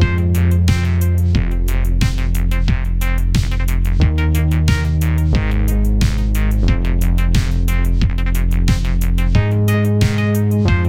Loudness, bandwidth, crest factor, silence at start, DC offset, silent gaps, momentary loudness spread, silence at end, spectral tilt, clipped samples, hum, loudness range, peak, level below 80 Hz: -17 LUFS; 16.5 kHz; 14 dB; 0 s; under 0.1%; none; 4 LU; 0 s; -6.5 dB/octave; under 0.1%; none; 1 LU; 0 dBFS; -16 dBFS